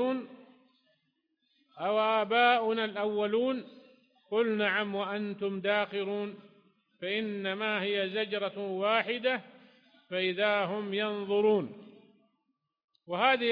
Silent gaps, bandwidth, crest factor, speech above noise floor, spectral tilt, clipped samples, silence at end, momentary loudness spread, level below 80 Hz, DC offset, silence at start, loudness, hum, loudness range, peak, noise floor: 12.84-12.88 s; 5.2 kHz; 20 dB; 51 dB; -7.5 dB/octave; under 0.1%; 0 s; 10 LU; -80 dBFS; under 0.1%; 0 s; -30 LUFS; none; 3 LU; -12 dBFS; -81 dBFS